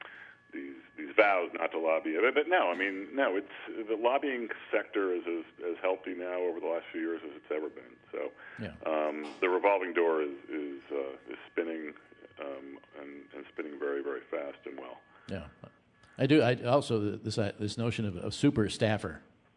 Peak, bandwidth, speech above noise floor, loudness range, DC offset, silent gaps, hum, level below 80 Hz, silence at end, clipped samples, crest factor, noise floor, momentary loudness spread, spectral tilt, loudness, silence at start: -8 dBFS; 11 kHz; 20 dB; 11 LU; under 0.1%; none; none; -68 dBFS; 0.35 s; under 0.1%; 24 dB; -52 dBFS; 18 LU; -6 dB/octave; -32 LUFS; 0.05 s